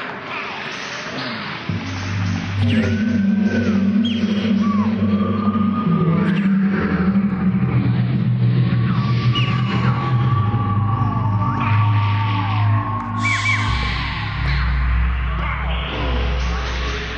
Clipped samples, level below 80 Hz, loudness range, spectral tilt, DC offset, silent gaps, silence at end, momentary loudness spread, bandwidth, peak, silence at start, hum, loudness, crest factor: under 0.1%; -28 dBFS; 3 LU; -7 dB/octave; under 0.1%; none; 0 s; 8 LU; 8.6 kHz; -8 dBFS; 0 s; none; -19 LUFS; 12 dB